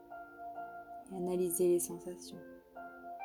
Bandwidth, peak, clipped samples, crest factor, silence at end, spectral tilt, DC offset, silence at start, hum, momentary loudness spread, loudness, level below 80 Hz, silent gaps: 19.5 kHz; -22 dBFS; under 0.1%; 16 dB; 0 s; -5.5 dB/octave; under 0.1%; 0 s; none; 20 LU; -36 LUFS; -72 dBFS; none